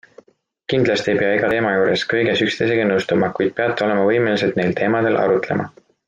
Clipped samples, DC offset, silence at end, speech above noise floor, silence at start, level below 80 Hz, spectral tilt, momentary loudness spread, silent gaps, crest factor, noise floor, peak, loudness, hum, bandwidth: under 0.1%; under 0.1%; 0.4 s; 39 dB; 0.7 s; -58 dBFS; -6 dB/octave; 3 LU; none; 14 dB; -57 dBFS; -4 dBFS; -18 LUFS; none; 9.2 kHz